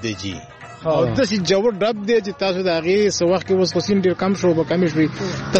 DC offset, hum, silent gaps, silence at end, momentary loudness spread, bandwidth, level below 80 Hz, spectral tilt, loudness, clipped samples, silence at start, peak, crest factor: under 0.1%; none; none; 0 s; 9 LU; 8.4 kHz; -50 dBFS; -5.5 dB/octave; -19 LUFS; under 0.1%; 0 s; -2 dBFS; 18 dB